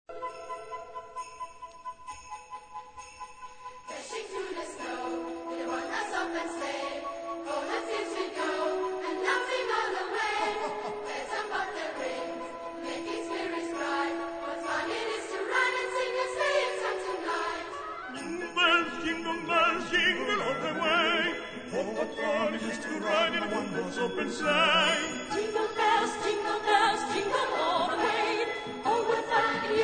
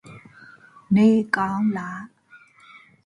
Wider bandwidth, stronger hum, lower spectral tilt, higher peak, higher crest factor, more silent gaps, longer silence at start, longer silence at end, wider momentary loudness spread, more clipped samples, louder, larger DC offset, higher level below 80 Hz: second, 9.4 kHz vs 10.5 kHz; neither; second, -3 dB/octave vs -7.5 dB/octave; second, -10 dBFS vs -4 dBFS; about the same, 20 dB vs 20 dB; neither; about the same, 0.1 s vs 0.05 s; second, 0 s vs 0.7 s; second, 16 LU vs 19 LU; neither; second, -30 LUFS vs -21 LUFS; neither; about the same, -64 dBFS vs -64 dBFS